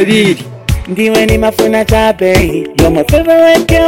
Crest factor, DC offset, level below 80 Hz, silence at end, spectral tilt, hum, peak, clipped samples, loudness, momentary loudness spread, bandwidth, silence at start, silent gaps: 8 dB; under 0.1%; -22 dBFS; 0 s; -5.5 dB/octave; none; 0 dBFS; under 0.1%; -9 LUFS; 8 LU; 17 kHz; 0 s; none